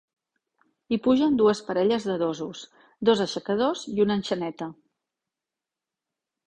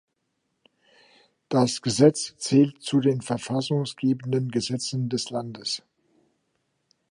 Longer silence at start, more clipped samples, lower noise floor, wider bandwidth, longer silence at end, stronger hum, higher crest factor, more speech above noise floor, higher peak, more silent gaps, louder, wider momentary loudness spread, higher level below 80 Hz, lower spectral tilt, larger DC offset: second, 0.9 s vs 1.5 s; neither; first, -89 dBFS vs -76 dBFS; second, 9.8 kHz vs 11.5 kHz; first, 1.75 s vs 1.3 s; neither; about the same, 18 dB vs 22 dB; first, 64 dB vs 52 dB; second, -8 dBFS vs -4 dBFS; neither; about the same, -25 LUFS vs -25 LUFS; about the same, 13 LU vs 11 LU; about the same, -64 dBFS vs -68 dBFS; about the same, -5.5 dB/octave vs -5.5 dB/octave; neither